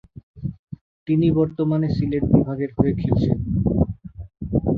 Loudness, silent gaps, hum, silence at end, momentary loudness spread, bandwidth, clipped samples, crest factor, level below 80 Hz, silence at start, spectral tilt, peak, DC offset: -21 LUFS; 0.23-0.34 s, 0.59-0.64 s, 0.81-1.06 s; none; 0 s; 18 LU; 5.2 kHz; under 0.1%; 20 dB; -36 dBFS; 0.15 s; -11 dB/octave; -2 dBFS; under 0.1%